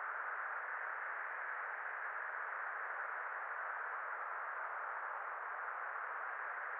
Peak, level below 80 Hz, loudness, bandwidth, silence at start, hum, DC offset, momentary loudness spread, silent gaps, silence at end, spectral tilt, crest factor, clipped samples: -30 dBFS; under -90 dBFS; -43 LUFS; 4.1 kHz; 0 s; none; under 0.1%; 1 LU; none; 0 s; 5.5 dB/octave; 12 dB; under 0.1%